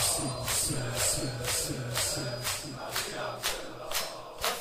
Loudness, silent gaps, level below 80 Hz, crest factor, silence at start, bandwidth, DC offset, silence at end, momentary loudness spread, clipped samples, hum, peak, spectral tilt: -31 LUFS; none; -50 dBFS; 20 dB; 0 s; 16 kHz; under 0.1%; 0 s; 6 LU; under 0.1%; none; -12 dBFS; -2 dB/octave